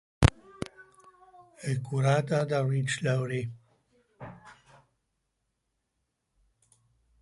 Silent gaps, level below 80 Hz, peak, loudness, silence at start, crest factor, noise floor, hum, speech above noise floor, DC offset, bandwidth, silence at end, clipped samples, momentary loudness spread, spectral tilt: none; -44 dBFS; -2 dBFS; -29 LUFS; 0.2 s; 30 dB; -80 dBFS; none; 52 dB; under 0.1%; 11.5 kHz; 2.7 s; under 0.1%; 20 LU; -6 dB/octave